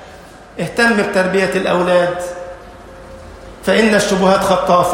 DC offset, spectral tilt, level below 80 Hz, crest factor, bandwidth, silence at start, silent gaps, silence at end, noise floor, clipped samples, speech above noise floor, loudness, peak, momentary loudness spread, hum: under 0.1%; -4.5 dB/octave; -42 dBFS; 14 dB; 16.5 kHz; 0 s; none; 0 s; -37 dBFS; under 0.1%; 24 dB; -14 LUFS; 0 dBFS; 23 LU; none